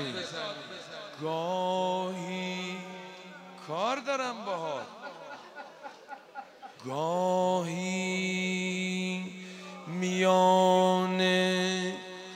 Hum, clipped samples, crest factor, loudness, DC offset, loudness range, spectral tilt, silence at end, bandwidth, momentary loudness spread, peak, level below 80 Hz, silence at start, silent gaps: none; under 0.1%; 20 dB; -29 LUFS; under 0.1%; 9 LU; -4.5 dB/octave; 0 s; 15.5 kHz; 20 LU; -12 dBFS; -80 dBFS; 0 s; none